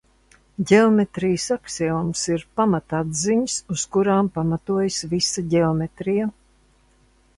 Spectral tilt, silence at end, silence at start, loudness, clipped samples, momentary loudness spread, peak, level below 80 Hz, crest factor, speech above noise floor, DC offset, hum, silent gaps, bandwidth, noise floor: -5 dB/octave; 1.05 s; 0.6 s; -21 LUFS; under 0.1%; 7 LU; -4 dBFS; -52 dBFS; 18 dB; 37 dB; under 0.1%; none; none; 11.5 kHz; -58 dBFS